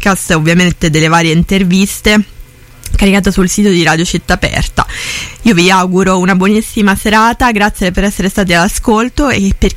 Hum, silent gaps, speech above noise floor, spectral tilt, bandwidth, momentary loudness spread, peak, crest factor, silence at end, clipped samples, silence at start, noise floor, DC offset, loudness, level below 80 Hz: none; none; 23 dB; -4.5 dB/octave; 16.5 kHz; 5 LU; 0 dBFS; 10 dB; 0 s; under 0.1%; 0 s; -33 dBFS; under 0.1%; -10 LUFS; -22 dBFS